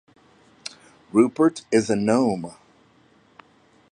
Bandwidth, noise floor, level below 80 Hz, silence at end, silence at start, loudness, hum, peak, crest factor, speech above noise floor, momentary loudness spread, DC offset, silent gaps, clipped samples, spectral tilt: 10.5 kHz; -57 dBFS; -64 dBFS; 1.4 s; 0.65 s; -21 LUFS; none; -4 dBFS; 20 dB; 37 dB; 19 LU; under 0.1%; none; under 0.1%; -6 dB/octave